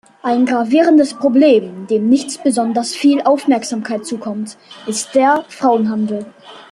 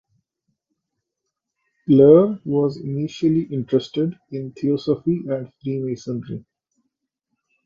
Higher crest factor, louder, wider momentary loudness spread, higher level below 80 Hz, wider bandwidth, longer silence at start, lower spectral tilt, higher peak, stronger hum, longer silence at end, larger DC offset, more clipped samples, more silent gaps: second, 14 dB vs 20 dB; first, -15 LUFS vs -20 LUFS; second, 12 LU vs 17 LU; about the same, -62 dBFS vs -60 dBFS; first, 12.5 kHz vs 7.4 kHz; second, 0.25 s vs 1.9 s; second, -4.5 dB/octave vs -9 dB/octave; about the same, -2 dBFS vs -2 dBFS; neither; second, 0.1 s vs 1.25 s; neither; neither; neither